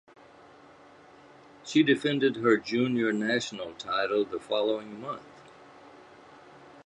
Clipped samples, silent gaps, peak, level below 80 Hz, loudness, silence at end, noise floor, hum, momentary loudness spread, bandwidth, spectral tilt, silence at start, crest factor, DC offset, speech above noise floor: under 0.1%; none; -10 dBFS; -72 dBFS; -28 LUFS; 0.05 s; -54 dBFS; none; 14 LU; 11 kHz; -5 dB/octave; 1.65 s; 20 dB; under 0.1%; 26 dB